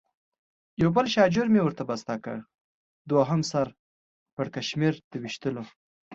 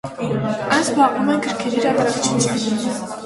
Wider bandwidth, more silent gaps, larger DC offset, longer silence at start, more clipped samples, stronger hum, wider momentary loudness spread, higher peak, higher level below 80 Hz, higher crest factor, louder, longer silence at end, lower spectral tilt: second, 7.8 kHz vs 11.5 kHz; first, 2.61-3.05 s, 3.79-4.26 s, 4.33-4.37 s, 5.04-5.11 s, 5.76-6.11 s vs none; neither; first, 0.8 s vs 0.05 s; neither; neither; first, 16 LU vs 6 LU; second, -6 dBFS vs -2 dBFS; second, -62 dBFS vs -54 dBFS; about the same, 22 dB vs 18 dB; second, -26 LUFS vs -19 LUFS; about the same, 0 s vs 0 s; first, -6 dB/octave vs -4 dB/octave